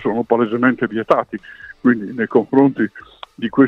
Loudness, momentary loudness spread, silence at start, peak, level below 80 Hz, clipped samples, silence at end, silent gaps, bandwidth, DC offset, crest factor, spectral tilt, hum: -17 LUFS; 15 LU; 0 s; 0 dBFS; -56 dBFS; under 0.1%; 0 s; none; 5.2 kHz; under 0.1%; 16 dB; -8.5 dB/octave; none